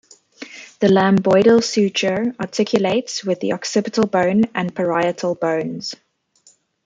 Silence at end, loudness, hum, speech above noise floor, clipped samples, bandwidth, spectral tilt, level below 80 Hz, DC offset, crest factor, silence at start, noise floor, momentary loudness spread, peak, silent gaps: 0.9 s; -18 LUFS; none; 38 dB; under 0.1%; 9.2 kHz; -5 dB/octave; -60 dBFS; under 0.1%; 16 dB; 0.4 s; -56 dBFS; 15 LU; -2 dBFS; none